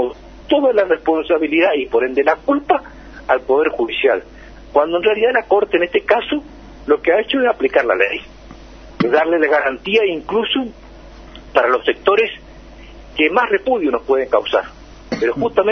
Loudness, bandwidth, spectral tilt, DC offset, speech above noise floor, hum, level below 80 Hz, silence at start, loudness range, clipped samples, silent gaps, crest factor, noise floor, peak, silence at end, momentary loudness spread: -16 LUFS; 6.4 kHz; -6 dB/octave; under 0.1%; 22 dB; none; -44 dBFS; 0 s; 2 LU; under 0.1%; none; 16 dB; -38 dBFS; 0 dBFS; 0 s; 7 LU